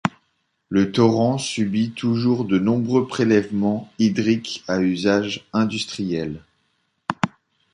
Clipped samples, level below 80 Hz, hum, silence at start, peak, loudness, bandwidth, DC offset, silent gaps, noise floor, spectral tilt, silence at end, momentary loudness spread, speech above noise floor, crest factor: under 0.1%; -56 dBFS; none; 0.05 s; -2 dBFS; -21 LUFS; 11 kHz; under 0.1%; none; -70 dBFS; -6 dB/octave; 0.45 s; 9 LU; 50 dB; 18 dB